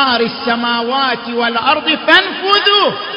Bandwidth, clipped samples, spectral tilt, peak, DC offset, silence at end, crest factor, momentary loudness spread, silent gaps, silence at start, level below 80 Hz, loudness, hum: 8 kHz; 0.1%; -4.5 dB/octave; 0 dBFS; under 0.1%; 0 s; 14 dB; 7 LU; none; 0 s; -54 dBFS; -12 LUFS; none